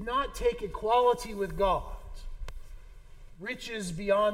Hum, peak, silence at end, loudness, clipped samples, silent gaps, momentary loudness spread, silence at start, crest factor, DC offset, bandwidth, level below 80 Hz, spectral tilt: none; -14 dBFS; 0 s; -30 LUFS; under 0.1%; none; 21 LU; 0 s; 18 dB; under 0.1%; 16.5 kHz; -42 dBFS; -4.5 dB/octave